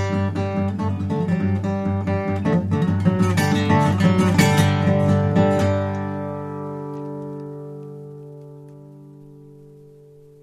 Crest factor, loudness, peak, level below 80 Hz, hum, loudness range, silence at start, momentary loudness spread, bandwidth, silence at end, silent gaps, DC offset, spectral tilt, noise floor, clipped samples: 18 dB; -20 LUFS; -2 dBFS; -54 dBFS; none; 17 LU; 0 s; 19 LU; 14 kHz; 0.65 s; none; under 0.1%; -7 dB/octave; -46 dBFS; under 0.1%